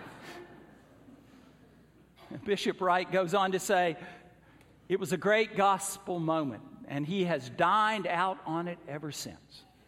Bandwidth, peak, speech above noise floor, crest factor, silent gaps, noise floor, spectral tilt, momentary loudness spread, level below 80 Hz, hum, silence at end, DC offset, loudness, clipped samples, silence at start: 16.5 kHz; -12 dBFS; 30 dB; 20 dB; none; -60 dBFS; -4.5 dB/octave; 17 LU; -70 dBFS; none; 0.25 s; under 0.1%; -30 LUFS; under 0.1%; 0 s